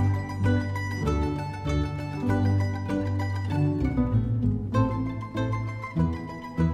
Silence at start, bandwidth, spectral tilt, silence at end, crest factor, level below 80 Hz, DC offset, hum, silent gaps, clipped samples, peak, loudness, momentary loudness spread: 0 s; 9.4 kHz; -8 dB/octave; 0 s; 14 dB; -38 dBFS; under 0.1%; none; none; under 0.1%; -12 dBFS; -27 LUFS; 6 LU